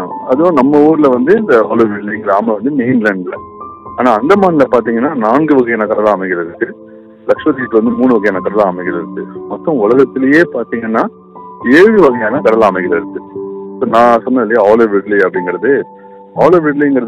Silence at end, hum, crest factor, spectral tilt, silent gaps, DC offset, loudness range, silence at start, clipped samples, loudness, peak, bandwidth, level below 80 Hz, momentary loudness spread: 0 s; none; 10 dB; -7.5 dB/octave; none; under 0.1%; 3 LU; 0 s; 1%; -11 LUFS; 0 dBFS; 9.8 kHz; -52 dBFS; 13 LU